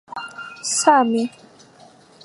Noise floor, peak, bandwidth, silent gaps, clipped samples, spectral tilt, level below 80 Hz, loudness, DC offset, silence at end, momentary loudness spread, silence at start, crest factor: -49 dBFS; -2 dBFS; 11.5 kHz; none; under 0.1%; -2 dB/octave; -74 dBFS; -18 LUFS; under 0.1%; 0.95 s; 18 LU; 0.1 s; 20 dB